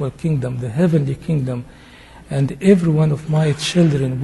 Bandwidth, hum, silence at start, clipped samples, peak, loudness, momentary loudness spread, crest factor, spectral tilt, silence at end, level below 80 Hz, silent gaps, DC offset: 11.5 kHz; none; 0 s; under 0.1%; -2 dBFS; -18 LUFS; 8 LU; 16 dB; -7 dB/octave; 0 s; -44 dBFS; none; under 0.1%